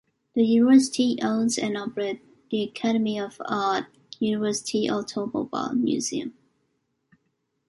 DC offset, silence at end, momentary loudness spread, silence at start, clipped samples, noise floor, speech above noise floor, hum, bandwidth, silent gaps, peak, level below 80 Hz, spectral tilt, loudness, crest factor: under 0.1%; 1.35 s; 13 LU; 0.35 s; under 0.1%; -75 dBFS; 51 dB; none; 11.5 kHz; none; -6 dBFS; -68 dBFS; -4.5 dB/octave; -25 LUFS; 18 dB